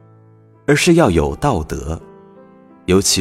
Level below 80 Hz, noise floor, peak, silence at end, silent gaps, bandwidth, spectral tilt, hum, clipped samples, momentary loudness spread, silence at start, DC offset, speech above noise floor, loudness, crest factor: -34 dBFS; -47 dBFS; 0 dBFS; 0 s; none; 16 kHz; -4.5 dB/octave; none; under 0.1%; 16 LU; 0.7 s; under 0.1%; 33 dB; -16 LUFS; 18 dB